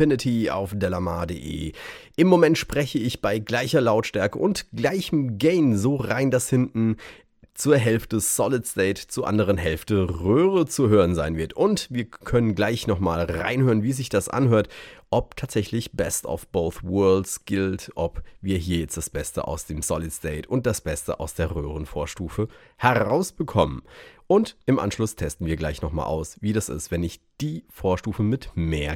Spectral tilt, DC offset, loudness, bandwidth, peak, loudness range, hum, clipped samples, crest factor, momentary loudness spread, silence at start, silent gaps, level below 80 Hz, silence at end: -5.5 dB/octave; under 0.1%; -24 LUFS; 18 kHz; -2 dBFS; 6 LU; none; under 0.1%; 20 dB; 10 LU; 0 s; none; -42 dBFS; 0 s